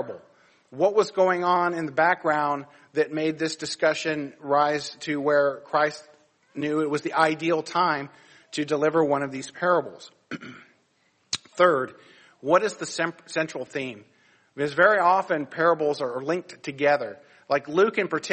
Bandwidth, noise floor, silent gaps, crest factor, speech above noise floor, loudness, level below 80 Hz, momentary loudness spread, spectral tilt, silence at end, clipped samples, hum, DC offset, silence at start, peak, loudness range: 8.8 kHz; -67 dBFS; none; 20 dB; 43 dB; -24 LUFS; -72 dBFS; 14 LU; -4.5 dB/octave; 0 s; under 0.1%; none; under 0.1%; 0 s; -4 dBFS; 3 LU